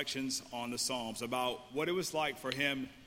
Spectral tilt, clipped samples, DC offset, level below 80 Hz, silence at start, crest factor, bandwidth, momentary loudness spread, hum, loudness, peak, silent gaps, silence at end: -2.5 dB/octave; under 0.1%; under 0.1%; -68 dBFS; 0 s; 20 dB; 16.5 kHz; 4 LU; none; -36 LUFS; -18 dBFS; none; 0 s